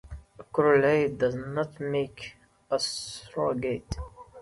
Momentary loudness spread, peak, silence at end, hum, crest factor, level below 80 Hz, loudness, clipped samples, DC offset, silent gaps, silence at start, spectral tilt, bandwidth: 21 LU; -10 dBFS; 0 s; none; 18 dB; -50 dBFS; -28 LUFS; under 0.1%; under 0.1%; none; 0.05 s; -5 dB/octave; 11.5 kHz